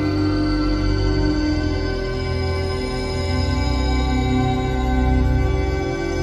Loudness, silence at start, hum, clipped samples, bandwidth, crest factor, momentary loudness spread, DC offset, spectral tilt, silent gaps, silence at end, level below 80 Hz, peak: -21 LUFS; 0 s; none; under 0.1%; 10.5 kHz; 12 dB; 4 LU; under 0.1%; -6.5 dB/octave; none; 0 s; -24 dBFS; -6 dBFS